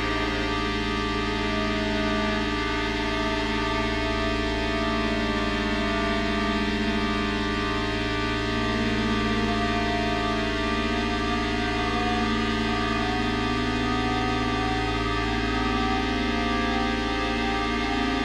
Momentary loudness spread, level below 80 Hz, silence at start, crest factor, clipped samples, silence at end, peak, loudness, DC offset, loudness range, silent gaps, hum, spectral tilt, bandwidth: 1 LU; -34 dBFS; 0 s; 14 dB; under 0.1%; 0 s; -12 dBFS; -25 LUFS; under 0.1%; 0 LU; none; none; -5 dB/octave; 12 kHz